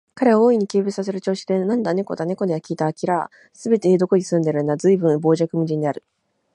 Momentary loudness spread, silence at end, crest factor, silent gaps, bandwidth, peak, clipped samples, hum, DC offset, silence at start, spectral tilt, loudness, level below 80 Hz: 8 LU; 0.55 s; 16 dB; none; 11 kHz; -4 dBFS; under 0.1%; none; under 0.1%; 0.15 s; -7 dB/octave; -20 LUFS; -68 dBFS